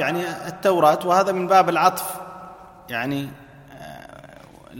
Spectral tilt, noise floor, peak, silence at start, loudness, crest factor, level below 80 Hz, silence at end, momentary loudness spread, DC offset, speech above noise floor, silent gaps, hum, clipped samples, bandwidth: -4.5 dB/octave; -45 dBFS; -2 dBFS; 0 s; -20 LUFS; 20 dB; -60 dBFS; 0 s; 23 LU; under 0.1%; 25 dB; none; none; under 0.1%; 17 kHz